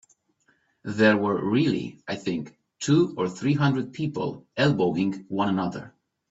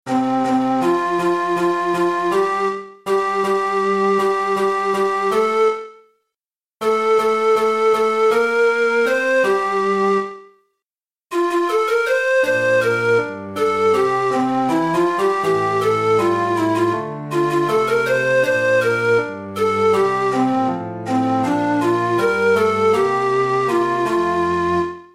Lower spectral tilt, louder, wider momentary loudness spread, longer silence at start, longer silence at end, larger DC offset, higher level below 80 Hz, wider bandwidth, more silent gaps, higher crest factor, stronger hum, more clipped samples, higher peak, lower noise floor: about the same, -6.5 dB/octave vs -5.5 dB/octave; second, -25 LUFS vs -18 LUFS; first, 12 LU vs 4 LU; first, 0.85 s vs 0.05 s; first, 0.4 s vs 0.1 s; second, under 0.1% vs 0.2%; about the same, -62 dBFS vs -60 dBFS; second, 8 kHz vs 15 kHz; neither; about the same, 18 dB vs 14 dB; neither; neither; about the same, -6 dBFS vs -4 dBFS; second, -67 dBFS vs under -90 dBFS